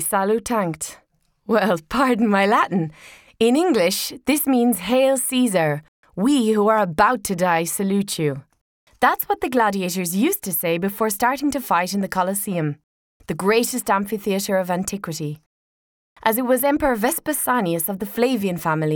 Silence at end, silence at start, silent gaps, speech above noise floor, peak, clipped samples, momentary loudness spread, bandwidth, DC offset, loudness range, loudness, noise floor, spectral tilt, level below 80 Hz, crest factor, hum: 0 s; 0 s; 5.88-6.03 s, 8.61-8.87 s, 12.84-13.20 s, 15.46-16.16 s; over 70 dB; -2 dBFS; under 0.1%; 8 LU; over 20 kHz; under 0.1%; 4 LU; -20 LUFS; under -90 dBFS; -4.5 dB/octave; -52 dBFS; 18 dB; none